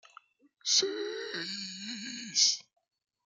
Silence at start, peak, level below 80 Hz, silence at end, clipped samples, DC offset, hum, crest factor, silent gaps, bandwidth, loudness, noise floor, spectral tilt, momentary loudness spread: 0.65 s; -12 dBFS; -88 dBFS; 0.65 s; under 0.1%; under 0.1%; none; 22 dB; none; 12 kHz; -30 LUFS; -60 dBFS; 0 dB/octave; 13 LU